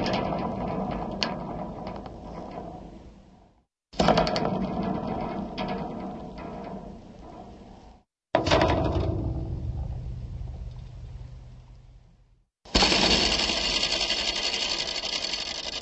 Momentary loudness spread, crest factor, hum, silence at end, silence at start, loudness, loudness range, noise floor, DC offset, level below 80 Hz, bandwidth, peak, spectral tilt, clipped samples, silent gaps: 21 LU; 24 dB; none; 0 s; 0 s; -26 LUFS; 12 LU; -62 dBFS; under 0.1%; -40 dBFS; 8.4 kHz; -6 dBFS; -4 dB/octave; under 0.1%; none